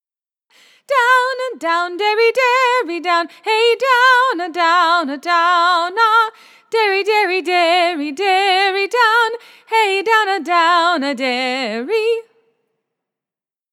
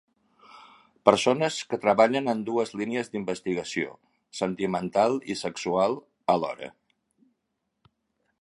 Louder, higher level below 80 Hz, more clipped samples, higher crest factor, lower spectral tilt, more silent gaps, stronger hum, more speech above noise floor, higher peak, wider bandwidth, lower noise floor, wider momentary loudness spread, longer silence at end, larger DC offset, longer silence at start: first, -15 LUFS vs -26 LUFS; second, under -90 dBFS vs -68 dBFS; neither; second, 16 dB vs 26 dB; second, -1 dB/octave vs -4.5 dB/octave; neither; neither; first, over 75 dB vs 54 dB; about the same, 0 dBFS vs -2 dBFS; first, 16.5 kHz vs 11.5 kHz; first, under -90 dBFS vs -79 dBFS; second, 7 LU vs 11 LU; second, 1.5 s vs 1.75 s; neither; first, 0.9 s vs 0.55 s